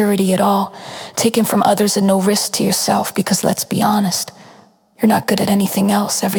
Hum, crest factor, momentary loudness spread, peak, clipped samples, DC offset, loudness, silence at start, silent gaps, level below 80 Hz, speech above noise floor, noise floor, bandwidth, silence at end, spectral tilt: none; 16 dB; 5 LU; 0 dBFS; under 0.1%; under 0.1%; -16 LUFS; 0 s; none; -58 dBFS; 32 dB; -47 dBFS; 19 kHz; 0 s; -4.5 dB/octave